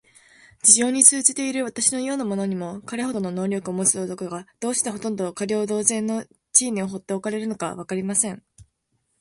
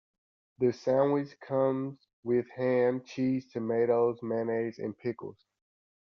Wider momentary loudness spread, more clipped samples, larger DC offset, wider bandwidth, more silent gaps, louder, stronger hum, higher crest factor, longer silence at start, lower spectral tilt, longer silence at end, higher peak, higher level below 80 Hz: first, 15 LU vs 10 LU; neither; neither; first, 12 kHz vs 6.8 kHz; second, none vs 2.13-2.23 s; first, -21 LUFS vs -30 LUFS; neither; first, 24 dB vs 16 dB; about the same, 0.65 s vs 0.6 s; second, -3 dB/octave vs -7 dB/octave; second, 0.55 s vs 0.75 s; first, 0 dBFS vs -14 dBFS; first, -64 dBFS vs -74 dBFS